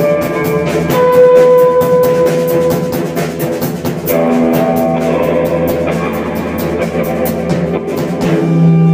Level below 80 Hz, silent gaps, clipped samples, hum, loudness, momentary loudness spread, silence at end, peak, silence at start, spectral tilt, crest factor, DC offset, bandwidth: -42 dBFS; none; 0.1%; none; -12 LUFS; 9 LU; 0 s; 0 dBFS; 0 s; -7 dB/octave; 12 dB; under 0.1%; 16 kHz